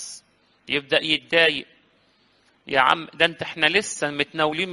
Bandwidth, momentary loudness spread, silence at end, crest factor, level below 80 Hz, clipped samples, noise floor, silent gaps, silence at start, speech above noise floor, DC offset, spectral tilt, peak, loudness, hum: 11.5 kHz; 8 LU; 0 s; 24 dB; -62 dBFS; under 0.1%; -62 dBFS; none; 0 s; 39 dB; under 0.1%; -2.5 dB/octave; 0 dBFS; -21 LUFS; none